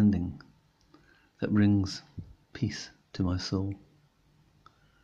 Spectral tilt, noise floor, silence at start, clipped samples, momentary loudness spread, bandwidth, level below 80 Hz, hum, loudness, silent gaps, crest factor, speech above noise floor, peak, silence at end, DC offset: -7 dB/octave; -65 dBFS; 0 s; under 0.1%; 22 LU; 7.8 kHz; -60 dBFS; none; -31 LUFS; none; 18 dB; 36 dB; -14 dBFS; 1.25 s; under 0.1%